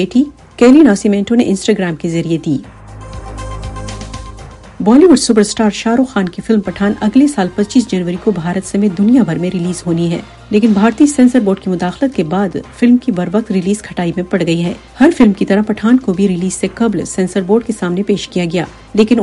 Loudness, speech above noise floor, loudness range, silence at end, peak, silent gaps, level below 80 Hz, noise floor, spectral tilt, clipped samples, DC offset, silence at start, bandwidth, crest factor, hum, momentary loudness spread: -13 LUFS; 20 dB; 3 LU; 0 s; 0 dBFS; none; -38 dBFS; -32 dBFS; -6 dB/octave; under 0.1%; under 0.1%; 0 s; 11.5 kHz; 12 dB; none; 12 LU